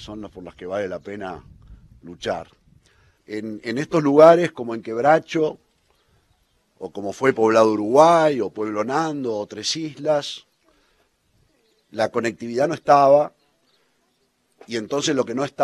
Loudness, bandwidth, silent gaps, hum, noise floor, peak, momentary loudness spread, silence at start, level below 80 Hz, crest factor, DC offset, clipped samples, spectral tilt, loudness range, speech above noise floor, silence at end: -20 LUFS; 12 kHz; none; none; -67 dBFS; 0 dBFS; 19 LU; 0 s; -60 dBFS; 22 dB; under 0.1%; under 0.1%; -5 dB/octave; 8 LU; 47 dB; 0 s